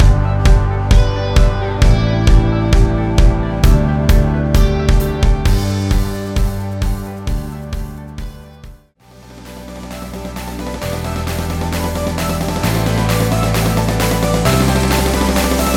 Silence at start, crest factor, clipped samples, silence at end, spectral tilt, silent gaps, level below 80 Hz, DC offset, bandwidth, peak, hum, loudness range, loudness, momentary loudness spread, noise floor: 0 s; 14 dB; under 0.1%; 0 s; -6 dB/octave; none; -16 dBFS; under 0.1%; 17 kHz; 0 dBFS; none; 13 LU; -16 LUFS; 14 LU; -43 dBFS